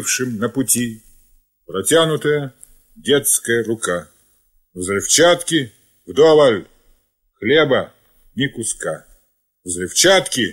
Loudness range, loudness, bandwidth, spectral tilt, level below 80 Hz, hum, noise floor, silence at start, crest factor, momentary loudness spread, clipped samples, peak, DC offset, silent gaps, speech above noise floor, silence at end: 4 LU; -16 LUFS; 16 kHz; -3 dB/octave; -54 dBFS; none; -62 dBFS; 0 s; 18 dB; 16 LU; under 0.1%; -2 dBFS; under 0.1%; none; 46 dB; 0 s